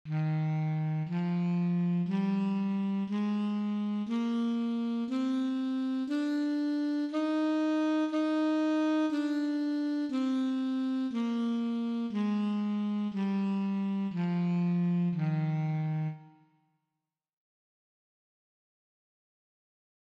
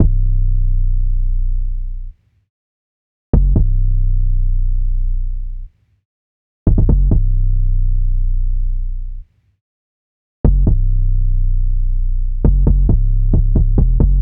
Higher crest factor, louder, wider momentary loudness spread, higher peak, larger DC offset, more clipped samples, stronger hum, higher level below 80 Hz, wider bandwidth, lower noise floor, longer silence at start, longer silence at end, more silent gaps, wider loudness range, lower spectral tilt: about the same, 10 dB vs 12 dB; second, -31 LUFS vs -19 LUFS; second, 3 LU vs 12 LU; second, -20 dBFS vs -2 dBFS; neither; neither; neither; second, -82 dBFS vs -14 dBFS; first, 8.2 kHz vs 1.3 kHz; about the same, -87 dBFS vs under -90 dBFS; about the same, 0.05 s vs 0 s; first, 3.75 s vs 0 s; second, none vs 2.50-3.33 s, 6.05-6.66 s, 9.61-10.44 s; about the same, 3 LU vs 5 LU; second, -8.5 dB/octave vs -15 dB/octave